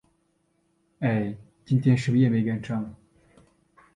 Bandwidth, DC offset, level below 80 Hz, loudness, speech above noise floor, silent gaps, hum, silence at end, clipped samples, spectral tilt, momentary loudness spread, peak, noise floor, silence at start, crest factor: 10 kHz; under 0.1%; -60 dBFS; -25 LUFS; 47 dB; none; none; 1 s; under 0.1%; -8.5 dB/octave; 12 LU; -10 dBFS; -70 dBFS; 1 s; 18 dB